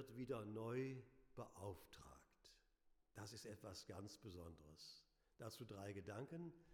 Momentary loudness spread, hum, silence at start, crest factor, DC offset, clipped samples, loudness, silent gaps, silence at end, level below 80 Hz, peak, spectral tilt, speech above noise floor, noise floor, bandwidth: 14 LU; none; 0 s; 18 dB; under 0.1%; under 0.1%; -55 LUFS; none; 0 s; -78 dBFS; -36 dBFS; -5.5 dB/octave; 25 dB; -79 dBFS; 19 kHz